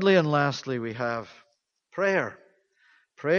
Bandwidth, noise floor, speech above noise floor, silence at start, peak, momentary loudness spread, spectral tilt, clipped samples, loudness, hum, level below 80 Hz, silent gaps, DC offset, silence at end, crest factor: 7.2 kHz; -68 dBFS; 43 dB; 0 s; -8 dBFS; 14 LU; -6 dB/octave; under 0.1%; -27 LUFS; none; -70 dBFS; none; under 0.1%; 0 s; 18 dB